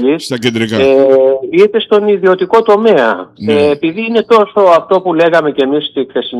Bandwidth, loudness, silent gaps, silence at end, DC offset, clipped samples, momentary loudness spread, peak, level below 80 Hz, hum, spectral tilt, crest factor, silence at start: 12 kHz; -10 LUFS; none; 0 s; under 0.1%; 0.1%; 6 LU; 0 dBFS; -56 dBFS; none; -5.5 dB/octave; 10 dB; 0 s